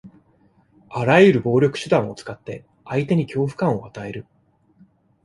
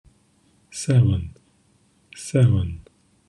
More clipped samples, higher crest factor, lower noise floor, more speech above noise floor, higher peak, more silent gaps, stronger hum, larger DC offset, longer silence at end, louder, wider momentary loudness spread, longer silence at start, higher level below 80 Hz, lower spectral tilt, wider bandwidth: neither; about the same, 20 dB vs 18 dB; about the same, -58 dBFS vs -61 dBFS; about the same, 39 dB vs 42 dB; first, -2 dBFS vs -6 dBFS; neither; neither; neither; first, 1.05 s vs 0.5 s; about the same, -19 LUFS vs -21 LUFS; about the same, 21 LU vs 19 LU; second, 0.05 s vs 0.75 s; second, -56 dBFS vs -46 dBFS; about the same, -7 dB/octave vs -7 dB/octave; about the same, 11.5 kHz vs 11 kHz